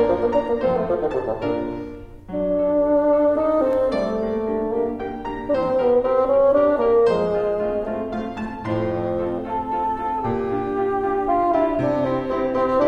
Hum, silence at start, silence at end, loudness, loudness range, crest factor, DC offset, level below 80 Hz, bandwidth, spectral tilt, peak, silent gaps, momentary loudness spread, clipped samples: none; 0 s; 0 s; -21 LUFS; 5 LU; 14 dB; under 0.1%; -44 dBFS; 8 kHz; -8.5 dB/octave; -6 dBFS; none; 9 LU; under 0.1%